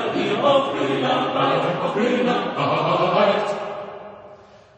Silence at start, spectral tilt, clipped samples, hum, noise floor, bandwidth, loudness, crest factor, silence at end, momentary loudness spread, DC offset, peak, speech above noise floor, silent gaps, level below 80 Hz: 0 s; -6 dB/octave; under 0.1%; none; -46 dBFS; 9.2 kHz; -20 LUFS; 16 dB; 0.45 s; 13 LU; under 0.1%; -6 dBFS; 26 dB; none; -62 dBFS